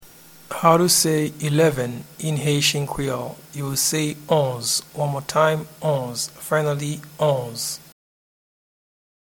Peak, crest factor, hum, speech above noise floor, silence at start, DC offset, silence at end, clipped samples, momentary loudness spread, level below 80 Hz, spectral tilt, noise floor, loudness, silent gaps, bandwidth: 0 dBFS; 22 dB; none; 25 dB; 0 s; under 0.1%; 1.5 s; under 0.1%; 12 LU; -54 dBFS; -4 dB/octave; -46 dBFS; -21 LUFS; none; 19 kHz